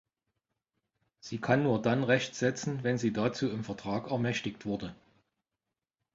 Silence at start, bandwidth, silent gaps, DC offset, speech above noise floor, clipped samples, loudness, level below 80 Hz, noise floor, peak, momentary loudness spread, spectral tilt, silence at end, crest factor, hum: 1.25 s; 7.8 kHz; none; under 0.1%; 58 dB; under 0.1%; -31 LUFS; -66 dBFS; -89 dBFS; -10 dBFS; 10 LU; -6 dB/octave; 1.2 s; 22 dB; none